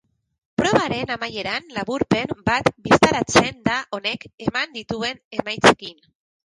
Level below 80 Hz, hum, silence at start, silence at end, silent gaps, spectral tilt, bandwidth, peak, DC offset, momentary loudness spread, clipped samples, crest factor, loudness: -48 dBFS; none; 0.6 s; 0.6 s; 4.34-4.38 s, 5.25-5.31 s; -4 dB/octave; 11.5 kHz; -2 dBFS; under 0.1%; 11 LU; under 0.1%; 20 dB; -21 LUFS